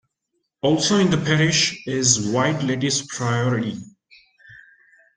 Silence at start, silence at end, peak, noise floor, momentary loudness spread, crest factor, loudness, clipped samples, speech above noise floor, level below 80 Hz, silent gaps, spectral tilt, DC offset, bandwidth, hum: 0.65 s; 0.6 s; -2 dBFS; -75 dBFS; 7 LU; 20 dB; -20 LUFS; under 0.1%; 55 dB; -56 dBFS; none; -4 dB/octave; under 0.1%; 10 kHz; none